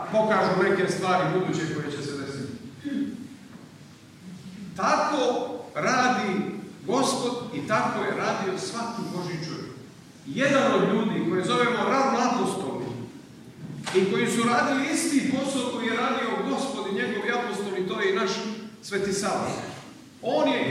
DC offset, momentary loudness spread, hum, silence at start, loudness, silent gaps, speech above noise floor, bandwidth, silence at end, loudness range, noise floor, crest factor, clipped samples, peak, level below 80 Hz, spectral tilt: under 0.1%; 16 LU; none; 0 s; -26 LUFS; none; 23 dB; 15 kHz; 0 s; 5 LU; -48 dBFS; 18 dB; under 0.1%; -10 dBFS; -66 dBFS; -4.5 dB/octave